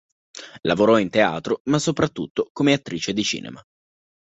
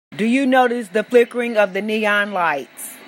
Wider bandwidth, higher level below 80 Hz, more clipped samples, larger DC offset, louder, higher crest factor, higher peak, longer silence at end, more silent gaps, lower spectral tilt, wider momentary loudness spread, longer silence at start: second, 8.4 kHz vs 16 kHz; first, -56 dBFS vs -74 dBFS; neither; neither; second, -21 LUFS vs -18 LUFS; about the same, 18 dB vs 16 dB; about the same, -4 dBFS vs -2 dBFS; first, 0.75 s vs 0 s; first, 1.60-1.65 s, 2.30-2.35 s, 2.50-2.55 s vs none; about the same, -5 dB/octave vs -4.5 dB/octave; first, 18 LU vs 6 LU; first, 0.35 s vs 0.1 s